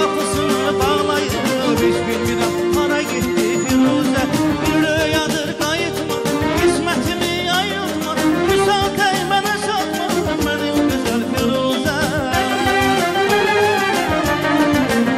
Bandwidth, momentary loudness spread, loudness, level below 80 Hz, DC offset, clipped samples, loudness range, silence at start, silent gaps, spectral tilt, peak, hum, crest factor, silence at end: 16 kHz; 4 LU; -17 LUFS; -38 dBFS; under 0.1%; under 0.1%; 2 LU; 0 s; none; -4 dB/octave; -6 dBFS; none; 12 dB; 0 s